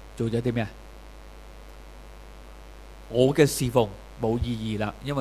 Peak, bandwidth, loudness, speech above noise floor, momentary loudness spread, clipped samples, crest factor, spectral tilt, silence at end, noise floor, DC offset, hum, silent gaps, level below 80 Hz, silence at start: -6 dBFS; 15.5 kHz; -26 LUFS; 20 dB; 25 LU; under 0.1%; 22 dB; -6 dB/octave; 0 s; -44 dBFS; under 0.1%; none; none; -44 dBFS; 0 s